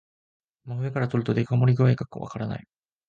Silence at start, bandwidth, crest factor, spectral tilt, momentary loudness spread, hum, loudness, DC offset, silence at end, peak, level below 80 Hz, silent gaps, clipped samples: 0.65 s; 7 kHz; 16 dB; -9 dB/octave; 14 LU; none; -25 LUFS; under 0.1%; 0.5 s; -10 dBFS; -58 dBFS; none; under 0.1%